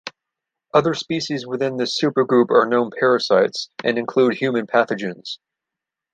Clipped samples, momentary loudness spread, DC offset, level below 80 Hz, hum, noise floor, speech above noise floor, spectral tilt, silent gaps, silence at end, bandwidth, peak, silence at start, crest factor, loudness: under 0.1%; 10 LU; under 0.1%; -66 dBFS; none; -85 dBFS; 66 dB; -5 dB/octave; none; 0.8 s; 9.2 kHz; -2 dBFS; 0.05 s; 18 dB; -19 LUFS